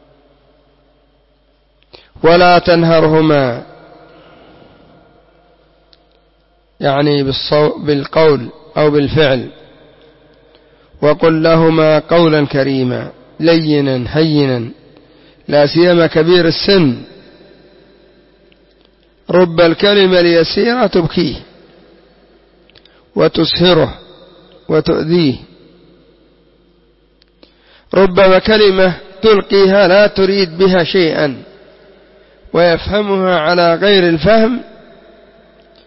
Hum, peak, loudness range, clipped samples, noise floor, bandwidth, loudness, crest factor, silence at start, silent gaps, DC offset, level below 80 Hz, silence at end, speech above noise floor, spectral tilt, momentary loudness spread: none; 0 dBFS; 6 LU; under 0.1%; -54 dBFS; 5.8 kHz; -11 LUFS; 12 dB; 2.2 s; none; under 0.1%; -40 dBFS; 1.25 s; 44 dB; -9.5 dB/octave; 10 LU